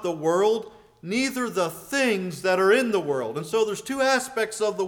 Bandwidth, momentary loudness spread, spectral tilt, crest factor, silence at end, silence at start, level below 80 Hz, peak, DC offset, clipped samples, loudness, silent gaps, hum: 20 kHz; 8 LU; -4 dB/octave; 16 dB; 0 s; 0 s; -66 dBFS; -8 dBFS; under 0.1%; under 0.1%; -24 LUFS; none; none